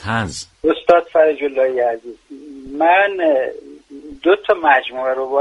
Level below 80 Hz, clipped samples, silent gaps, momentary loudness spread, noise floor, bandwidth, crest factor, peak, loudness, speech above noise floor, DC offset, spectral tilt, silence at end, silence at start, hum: -50 dBFS; under 0.1%; none; 19 LU; -36 dBFS; 11.5 kHz; 16 dB; 0 dBFS; -16 LUFS; 20 dB; under 0.1%; -5 dB/octave; 0 s; 0 s; none